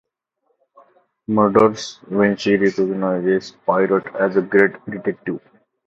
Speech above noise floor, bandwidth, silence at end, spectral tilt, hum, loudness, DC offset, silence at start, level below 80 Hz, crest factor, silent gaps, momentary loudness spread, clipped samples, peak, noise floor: 52 dB; 7.8 kHz; 0.5 s; -6.5 dB/octave; none; -18 LUFS; under 0.1%; 1.3 s; -58 dBFS; 20 dB; none; 12 LU; under 0.1%; 0 dBFS; -70 dBFS